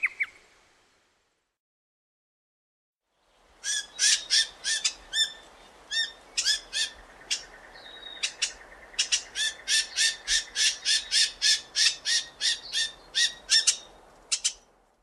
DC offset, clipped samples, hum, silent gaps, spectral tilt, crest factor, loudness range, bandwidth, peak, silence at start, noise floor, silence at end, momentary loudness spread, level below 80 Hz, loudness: under 0.1%; under 0.1%; none; 1.59-2.96 s; 4 dB/octave; 24 dB; 7 LU; 14 kHz; -6 dBFS; 0 s; -73 dBFS; 0.5 s; 11 LU; -62 dBFS; -25 LUFS